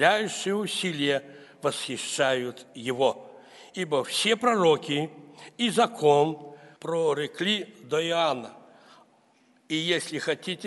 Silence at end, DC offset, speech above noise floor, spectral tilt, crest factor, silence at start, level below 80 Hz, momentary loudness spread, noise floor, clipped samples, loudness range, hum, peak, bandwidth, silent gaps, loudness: 0 s; under 0.1%; 37 dB; -3.5 dB/octave; 22 dB; 0 s; -76 dBFS; 15 LU; -63 dBFS; under 0.1%; 4 LU; none; -6 dBFS; 11.5 kHz; none; -26 LUFS